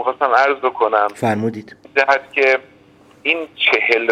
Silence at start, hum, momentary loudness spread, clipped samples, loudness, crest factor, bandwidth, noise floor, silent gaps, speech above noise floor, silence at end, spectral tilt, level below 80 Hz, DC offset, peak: 0 s; none; 7 LU; under 0.1%; -16 LUFS; 18 dB; 14 kHz; -48 dBFS; none; 31 dB; 0 s; -4.5 dB/octave; -68 dBFS; under 0.1%; 0 dBFS